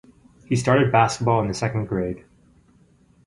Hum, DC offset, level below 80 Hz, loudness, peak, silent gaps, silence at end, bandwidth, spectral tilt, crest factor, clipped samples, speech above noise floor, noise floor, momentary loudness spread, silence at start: none; under 0.1%; -48 dBFS; -21 LUFS; -2 dBFS; none; 1.1 s; 11.5 kHz; -6 dB/octave; 20 dB; under 0.1%; 36 dB; -57 dBFS; 10 LU; 0.5 s